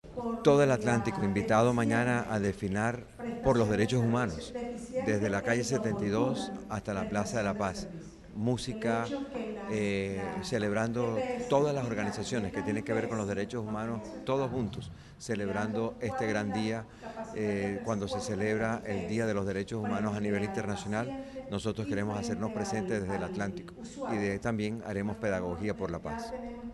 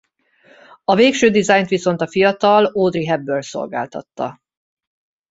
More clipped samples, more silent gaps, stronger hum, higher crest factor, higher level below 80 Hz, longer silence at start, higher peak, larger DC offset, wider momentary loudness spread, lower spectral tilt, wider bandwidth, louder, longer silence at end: neither; neither; neither; about the same, 20 dB vs 16 dB; about the same, -54 dBFS vs -58 dBFS; second, 0.05 s vs 0.9 s; second, -12 dBFS vs -2 dBFS; neither; second, 10 LU vs 14 LU; about the same, -6 dB/octave vs -5 dB/octave; first, 12.5 kHz vs 8 kHz; second, -32 LUFS vs -17 LUFS; second, 0 s vs 1 s